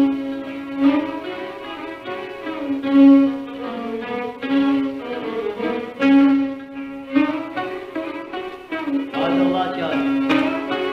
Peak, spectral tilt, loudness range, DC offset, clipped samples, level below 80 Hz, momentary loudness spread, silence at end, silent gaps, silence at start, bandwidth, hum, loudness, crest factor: -4 dBFS; -6.5 dB/octave; 4 LU; under 0.1%; under 0.1%; -58 dBFS; 15 LU; 0 s; none; 0 s; 6 kHz; none; -20 LUFS; 16 dB